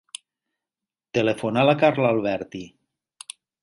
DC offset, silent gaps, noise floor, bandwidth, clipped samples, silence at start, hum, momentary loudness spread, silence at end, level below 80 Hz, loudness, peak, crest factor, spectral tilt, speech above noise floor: under 0.1%; none; -90 dBFS; 11.5 kHz; under 0.1%; 1.15 s; none; 22 LU; 0.95 s; -62 dBFS; -22 LUFS; -4 dBFS; 20 dB; -6 dB/octave; 68 dB